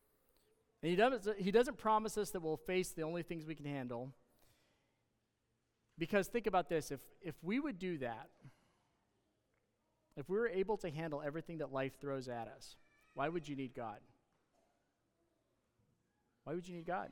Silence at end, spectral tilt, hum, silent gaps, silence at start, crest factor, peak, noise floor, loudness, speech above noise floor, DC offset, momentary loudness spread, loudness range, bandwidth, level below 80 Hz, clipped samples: 0 s; -5.5 dB/octave; none; none; 0.85 s; 22 dB; -18 dBFS; -84 dBFS; -40 LUFS; 44 dB; under 0.1%; 17 LU; 11 LU; 18 kHz; -68 dBFS; under 0.1%